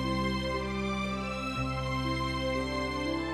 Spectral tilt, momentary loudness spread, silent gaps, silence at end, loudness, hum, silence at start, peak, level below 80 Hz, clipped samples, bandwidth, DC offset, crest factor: -5.5 dB/octave; 2 LU; none; 0 s; -32 LUFS; none; 0 s; -18 dBFS; -42 dBFS; under 0.1%; 13.5 kHz; under 0.1%; 14 dB